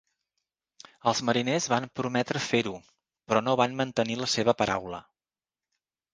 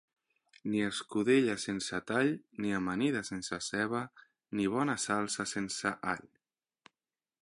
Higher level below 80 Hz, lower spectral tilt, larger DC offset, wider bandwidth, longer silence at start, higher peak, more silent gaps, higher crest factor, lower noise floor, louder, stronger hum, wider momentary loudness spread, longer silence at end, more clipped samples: first, -64 dBFS vs -70 dBFS; about the same, -4 dB/octave vs -4 dB/octave; neither; second, 10 kHz vs 11.5 kHz; first, 1.05 s vs 0.65 s; first, -6 dBFS vs -14 dBFS; neither; about the same, 24 dB vs 20 dB; about the same, under -90 dBFS vs under -90 dBFS; first, -27 LUFS vs -33 LUFS; neither; about the same, 7 LU vs 9 LU; about the same, 1.15 s vs 1.2 s; neither